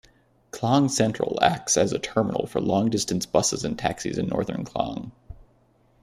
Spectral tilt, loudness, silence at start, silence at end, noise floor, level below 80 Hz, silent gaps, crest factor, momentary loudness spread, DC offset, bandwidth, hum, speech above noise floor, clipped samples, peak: -4.5 dB/octave; -24 LUFS; 0.55 s; 0.6 s; -61 dBFS; -52 dBFS; none; 20 dB; 9 LU; under 0.1%; 15 kHz; none; 37 dB; under 0.1%; -4 dBFS